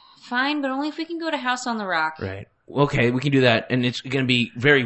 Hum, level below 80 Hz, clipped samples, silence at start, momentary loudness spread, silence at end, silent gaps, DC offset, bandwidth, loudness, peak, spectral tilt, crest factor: none; -52 dBFS; under 0.1%; 0.25 s; 10 LU; 0 s; none; under 0.1%; 8.4 kHz; -22 LUFS; -4 dBFS; -5.5 dB/octave; 20 dB